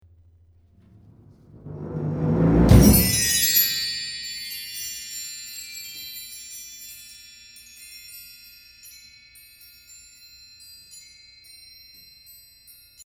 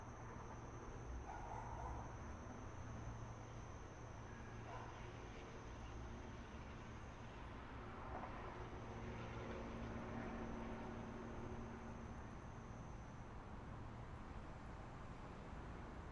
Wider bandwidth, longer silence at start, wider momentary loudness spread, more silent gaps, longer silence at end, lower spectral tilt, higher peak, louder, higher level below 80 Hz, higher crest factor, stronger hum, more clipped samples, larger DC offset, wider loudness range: first, over 20 kHz vs 10.5 kHz; first, 1.65 s vs 0 s; first, 28 LU vs 5 LU; neither; first, 2.05 s vs 0 s; second, -4 dB/octave vs -6.5 dB/octave; first, -2 dBFS vs -36 dBFS; first, -21 LUFS vs -53 LUFS; first, -34 dBFS vs -58 dBFS; first, 24 dB vs 16 dB; first, 60 Hz at -50 dBFS vs none; neither; neither; first, 24 LU vs 4 LU